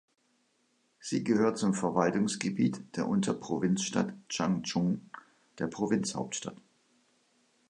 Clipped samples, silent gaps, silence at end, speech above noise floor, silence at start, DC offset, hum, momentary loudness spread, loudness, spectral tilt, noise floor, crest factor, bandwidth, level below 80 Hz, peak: under 0.1%; none; 1.15 s; 42 dB; 1 s; under 0.1%; none; 10 LU; -31 LUFS; -5 dB/octave; -73 dBFS; 20 dB; 11 kHz; -68 dBFS; -12 dBFS